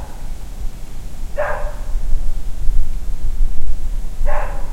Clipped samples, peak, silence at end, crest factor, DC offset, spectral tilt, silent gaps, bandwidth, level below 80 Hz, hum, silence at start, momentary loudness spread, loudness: under 0.1%; 0 dBFS; 0 s; 12 dB; under 0.1%; -6 dB/octave; none; 2.9 kHz; -18 dBFS; none; 0 s; 10 LU; -27 LUFS